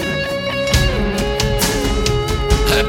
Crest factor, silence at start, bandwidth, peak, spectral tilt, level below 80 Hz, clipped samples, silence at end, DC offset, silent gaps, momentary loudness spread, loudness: 16 dB; 0 s; 17.5 kHz; 0 dBFS; -4 dB/octave; -22 dBFS; under 0.1%; 0 s; under 0.1%; none; 4 LU; -17 LUFS